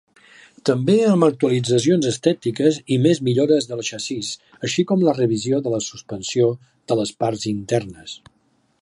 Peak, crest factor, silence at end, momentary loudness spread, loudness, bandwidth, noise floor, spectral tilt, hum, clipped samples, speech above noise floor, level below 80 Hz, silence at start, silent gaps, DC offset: -2 dBFS; 18 dB; 0.65 s; 12 LU; -20 LUFS; 11.5 kHz; -63 dBFS; -5.5 dB/octave; none; under 0.1%; 44 dB; -60 dBFS; 0.65 s; none; under 0.1%